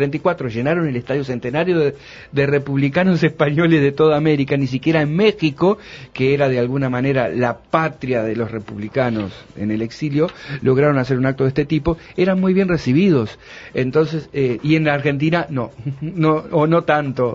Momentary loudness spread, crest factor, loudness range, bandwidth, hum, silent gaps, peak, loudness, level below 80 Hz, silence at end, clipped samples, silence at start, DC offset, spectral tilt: 9 LU; 16 dB; 4 LU; 7.4 kHz; none; none; -2 dBFS; -18 LUFS; -46 dBFS; 0 s; under 0.1%; 0 s; under 0.1%; -8 dB/octave